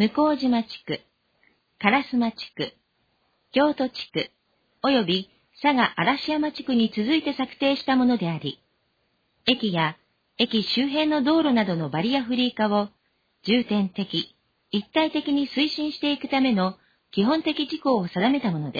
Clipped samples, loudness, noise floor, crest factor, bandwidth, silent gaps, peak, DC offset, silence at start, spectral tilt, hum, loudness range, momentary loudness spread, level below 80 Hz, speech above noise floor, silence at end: under 0.1%; -24 LUFS; -70 dBFS; 20 dB; 5 kHz; none; -4 dBFS; under 0.1%; 0 s; -7 dB/octave; none; 3 LU; 10 LU; -64 dBFS; 47 dB; 0 s